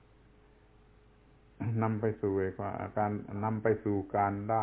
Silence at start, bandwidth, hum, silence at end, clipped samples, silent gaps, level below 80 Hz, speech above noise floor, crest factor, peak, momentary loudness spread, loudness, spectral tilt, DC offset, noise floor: 1.6 s; 3.7 kHz; none; 0 s; under 0.1%; none; -58 dBFS; 29 dB; 20 dB; -14 dBFS; 6 LU; -33 LUFS; -9.5 dB/octave; under 0.1%; -61 dBFS